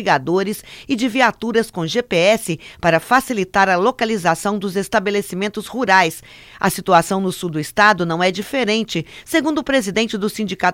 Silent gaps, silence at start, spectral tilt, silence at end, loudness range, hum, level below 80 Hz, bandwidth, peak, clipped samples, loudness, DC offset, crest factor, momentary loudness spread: none; 0 s; -4.5 dB/octave; 0 s; 1 LU; none; -50 dBFS; 17 kHz; 0 dBFS; under 0.1%; -18 LUFS; under 0.1%; 18 dB; 9 LU